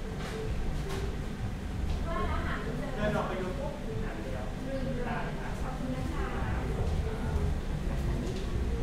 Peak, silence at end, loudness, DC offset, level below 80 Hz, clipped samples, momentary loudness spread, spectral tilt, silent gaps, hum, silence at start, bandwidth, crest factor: -18 dBFS; 0 s; -35 LUFS; under 0.1%; -36 dBFS; under 0.1%; 4 LU; -6.5 dB/octave; none; none; 0 s; 15 kHz; 14 dB